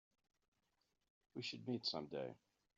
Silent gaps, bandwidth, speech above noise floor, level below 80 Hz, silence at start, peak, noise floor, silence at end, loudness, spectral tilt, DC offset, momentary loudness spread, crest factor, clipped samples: none; 7.4 kHz; 39 dB; -88 dBFS; 1.35 s; -30 dBFS; -86 dBFS; 0.4 s; -46 LUFS; -3.5 dB/octave; under 0.1%; 12 LU; 22 dB; under 0.1%